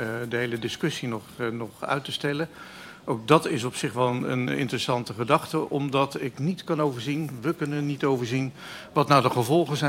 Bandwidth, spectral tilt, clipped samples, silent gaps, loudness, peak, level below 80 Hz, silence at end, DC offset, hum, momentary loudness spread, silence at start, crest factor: 16 kHz; -5.5 dB/octave; under 0.1%; none; -26 LUFS; -2 dBFS; -64 dBFS; 0 s; under 0.1%; none; 10 LU; 0 s; 24 dB